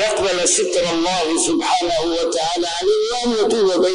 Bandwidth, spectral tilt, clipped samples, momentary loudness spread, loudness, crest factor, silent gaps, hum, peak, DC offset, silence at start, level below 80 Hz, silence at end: 11 kHz; -2 dB/octave; under 0.1%; 4 LU; -17 LUFS; 12 dB; none; none; -6 dBFS; under 0.1%; 0 s; -46 dBFS; 0 s